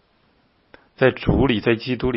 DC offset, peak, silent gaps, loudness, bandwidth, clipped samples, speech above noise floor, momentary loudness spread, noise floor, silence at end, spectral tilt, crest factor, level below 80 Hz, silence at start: under 0.1%; -4 dBFS; none; -20 LUFS; 5.8 kHz; under 0.1%; 42 dB; 3 LU; -61 dBFS; 0 s; -11.5 dB/octave; 18 dB; -36 dBFS; 1 s